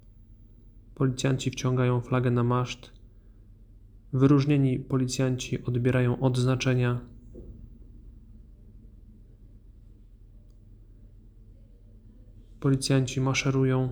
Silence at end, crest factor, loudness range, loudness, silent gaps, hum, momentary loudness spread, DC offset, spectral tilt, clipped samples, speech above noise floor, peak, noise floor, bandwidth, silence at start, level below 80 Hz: 0 s; 20 dB; 7 LU; -26 LUFS; none; none; 12 LU; under 0.1%; -6.5 dB/octave; under 0.1%; 27 dB; -8 dBFS; -51 dBFS; 11 kHz; 0.3 s; -50 dBFS